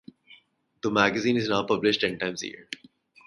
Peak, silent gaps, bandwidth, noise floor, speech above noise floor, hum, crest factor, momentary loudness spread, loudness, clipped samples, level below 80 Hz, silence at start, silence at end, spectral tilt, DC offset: -4 dBFS; none; 11.5 kHz; -60 dBFS; 34 dB; none; 24 dB; 16 LU; -25 LUFS; under 0.1%; -64 dBFS; 0.3 s; 0.5 s; -4.5 dB/octave; under 0.1%